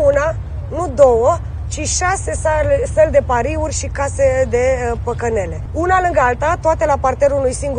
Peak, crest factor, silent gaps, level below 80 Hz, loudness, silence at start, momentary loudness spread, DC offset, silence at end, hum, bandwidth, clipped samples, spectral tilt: 0 dBFS; 16 dB; none; -26 dBFS; -16 LUFS; 0 s; 8 LU; under 0.1%; 0 s; none; 10 kHz; under 0.1%; -5 dB/octave